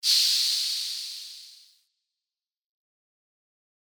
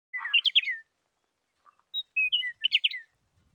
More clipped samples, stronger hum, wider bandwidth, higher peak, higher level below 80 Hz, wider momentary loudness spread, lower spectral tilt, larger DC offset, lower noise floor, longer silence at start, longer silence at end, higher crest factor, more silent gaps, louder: neither; neither; about the same, over 20 kHz vs over 20 kHz; about the same, -10 dBFS vs -12 dBFS; second, under -90 dBFS vs -84 dBFS; first, 21 LU vs 14 LU; second, 7.5 dB/octave vs 3.5 dB/octave; neither; first, under -90 dBFS vs -78 dBFS; about the same, 0.05 s vs 0.15 s; first, 2.45 s vs 0.5 s; about the same, 22 dB vs 20 dB; neither; about the same, -23 LUFS vs -25 LUFS